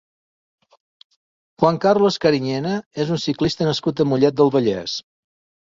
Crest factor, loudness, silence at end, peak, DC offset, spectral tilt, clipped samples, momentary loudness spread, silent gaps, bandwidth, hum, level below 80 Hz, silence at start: 18 dB; -19 LUFS; 0.8 s; -2 dBFS; under 0.1%; -6 dB/octave; under 0.1%; 8 LU; 2.86-2.91 s; 7.6 kHz; none; -54 dBFS; 1.6 s